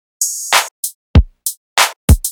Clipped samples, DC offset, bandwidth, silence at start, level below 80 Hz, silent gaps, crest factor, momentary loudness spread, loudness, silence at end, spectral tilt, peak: under 0.1%; under 0.1%; 19.5 kHz; 0.2 s; -20 dBFS; 0.71-0.83 s, 0.95-1.14 s, 1.57-1.76 s, 1.96-2.08 s; 14 dB; 9 LU; -15 LUFS; 0 s; -3 dB/octave; 0 dBFS